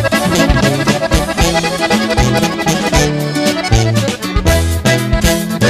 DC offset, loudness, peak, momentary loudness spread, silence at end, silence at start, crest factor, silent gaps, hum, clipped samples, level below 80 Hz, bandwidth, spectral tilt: under 0.1%; -13 LUFS; 0 dBFS; 3 LU; 0 s; 0 s; 12 dB; none; none; under 0.1%; -20 dBFS; 15.5 kHz; -4.5 dB/octave